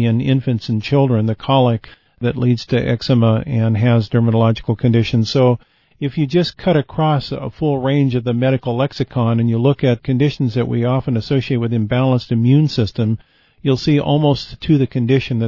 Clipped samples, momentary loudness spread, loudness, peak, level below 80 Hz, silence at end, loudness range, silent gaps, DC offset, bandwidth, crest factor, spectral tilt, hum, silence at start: under 0.1%; 6 LU; -17 LUFS; -2 dBFS; -44 dBFS; 0 s; 2 LU; none; 0.2%; 6 kHz; 14 dB; -8 dB/octave; none; 0 s